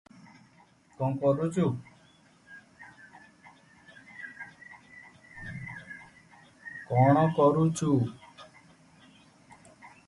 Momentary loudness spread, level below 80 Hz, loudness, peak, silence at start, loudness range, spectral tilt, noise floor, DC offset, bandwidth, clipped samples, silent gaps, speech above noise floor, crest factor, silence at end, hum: 28 LU; -64 dBFS; -27 LUFS; -10 dBFS; 1 s; 20 LU; -7.5 dB/octave; -61 dBFS; under 0.1%; 11.5 kHz; under 0.1%; none; 36 dB; 22 dB; 0.2 s; none